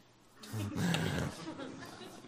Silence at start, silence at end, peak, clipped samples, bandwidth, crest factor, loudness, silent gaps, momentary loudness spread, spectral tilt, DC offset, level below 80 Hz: 0.25 s; 0 s; -14 dBFS; under 0.1%; 15.5 kHz; 24 dB; -38 LUFS; none; 14 LU; -5 dB/octave; under 0.1%; -60 dBFS